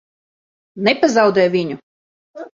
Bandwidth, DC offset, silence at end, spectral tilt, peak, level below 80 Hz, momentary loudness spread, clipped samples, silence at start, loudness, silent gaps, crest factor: 7.6 kHz; under 0.1%; 0.05 s; -5 dB/octave; -2 dBFS; -62 dBFS; 18 LU; under 0.1%; 0.75 s; -16 LUFS; 1.83-2.34 s; 18 dB